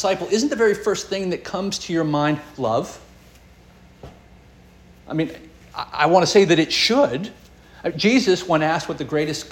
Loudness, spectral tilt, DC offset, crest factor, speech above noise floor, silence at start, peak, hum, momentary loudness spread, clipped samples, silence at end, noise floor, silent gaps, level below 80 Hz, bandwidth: -20 LUFS; -4.5 dB/octave; under 0.1%; 20 dB; 29 dB; 0 s; -2 dBFS; none; 14 LU; under 0.1%; 0 s; -48 dBFS; none; -52 dBFS; 17 kHz